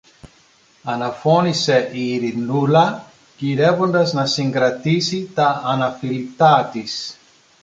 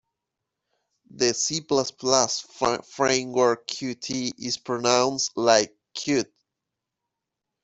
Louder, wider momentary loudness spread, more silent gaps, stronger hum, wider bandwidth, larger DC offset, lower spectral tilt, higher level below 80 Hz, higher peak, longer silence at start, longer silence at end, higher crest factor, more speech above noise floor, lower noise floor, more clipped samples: first, -18 LUFS vs -24 LUFS; about the same, 11 LU vs 9 LU; neither; neither; first, 9.2 kHz vs 8.2 kHz; neither; first, -5.5 dB/octave vs -2.5 dB/octave; about the same, -60 dBFS vs -64 dBFS; about the same, -2 dBFS vs -2 dBFS; second, 0.25 s vs 1.15 s; second, 0.5 s vs 1.4 s; second, 16 dB vs 24 dB; second, 36 dB vs 61 dB; second, -54 dBFS vs -85 dBFS; neither